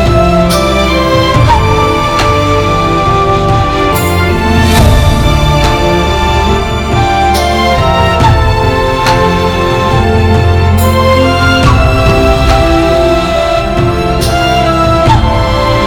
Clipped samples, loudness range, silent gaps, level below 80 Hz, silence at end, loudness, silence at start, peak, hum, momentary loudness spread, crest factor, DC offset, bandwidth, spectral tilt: 0.6%; 1 LU; none; -16 dBFS; 0 s; -9 LUFS; 0 s; 0 dBFS; none; 3 LU; 8 dB; under 0.1%; 19.5 kHz; -5.5 dB/octave